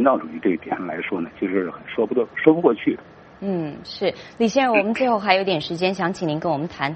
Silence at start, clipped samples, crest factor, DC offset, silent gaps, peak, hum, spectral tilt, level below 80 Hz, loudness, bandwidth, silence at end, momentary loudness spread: 0 s; under 0.1%; 20 dB; under 0.1%; none; 0 dBFS; none; -6 dB/octave; -60 dBFS; -22 LUFS; 8.4 kHz; 0 s; 9 LU